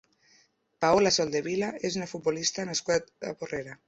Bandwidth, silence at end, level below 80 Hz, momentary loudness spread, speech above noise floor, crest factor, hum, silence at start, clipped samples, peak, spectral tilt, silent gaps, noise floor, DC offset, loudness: 8.2 kHz; 0.15 s; -62 dBFS; 13 LU; 37 dB; 18 dB; none; 0.8 s; under 0.1%; -10 dBFS; -3 dB/octave; none; -65 dBFS; under 0.1%; -28 LUFS